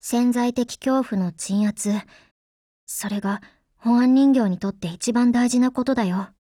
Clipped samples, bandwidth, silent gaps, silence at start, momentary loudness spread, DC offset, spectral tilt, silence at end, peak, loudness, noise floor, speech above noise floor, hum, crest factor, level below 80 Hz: under 0.1%; 16 kHz; 2.31-2.87 s; 0.05 s; 11 LU; under 0.1%; -5.5 dB/octave; 0.15 s; -8 dBFS; -22 LUFS; under -90 dBFS; over 69 dB; none; 14 dB; -60 dBFS